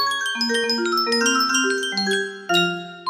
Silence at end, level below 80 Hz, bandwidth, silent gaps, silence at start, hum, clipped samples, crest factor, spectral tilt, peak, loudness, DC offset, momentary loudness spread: 0 s; -70 dBFS; 15.5 kHz; none; 0 s; none; under 0.1%; 16 dB; -2 dB/octave; -6 dBFS; -20 LUFS; under 0.1%; 4 LU